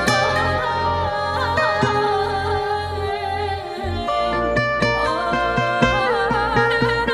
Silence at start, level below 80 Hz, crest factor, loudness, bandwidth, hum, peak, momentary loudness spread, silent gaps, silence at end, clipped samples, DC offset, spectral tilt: 0 s; -38 dBFS; 16 dB; -20 LUFS; 14.5 kHz; none; -2 dBFS; 6 LU; none; 0 s; under 0.1%; under 0.1%; -5 dB/octave